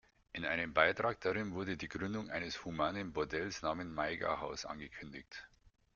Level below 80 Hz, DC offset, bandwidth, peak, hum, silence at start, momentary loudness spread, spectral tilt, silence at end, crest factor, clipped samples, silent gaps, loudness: -64 dBFS; under 0.1%; 7.2 kHz; -12 dBFS; none; 0.35 s; 17 LU; -3 dB/octave; 0.5 s; 28 dB; under 0.1%; none; -38 LUFS